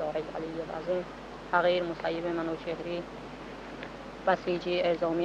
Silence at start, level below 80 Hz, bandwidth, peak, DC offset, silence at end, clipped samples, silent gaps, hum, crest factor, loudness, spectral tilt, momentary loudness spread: 0 s; -56 dBFS; 9 kHz; -12 dBFS; under 0.1%; 0 s; under 0.1%; none; none; 20 dB; -32 LUFS; -6 dB/octave; 15 LU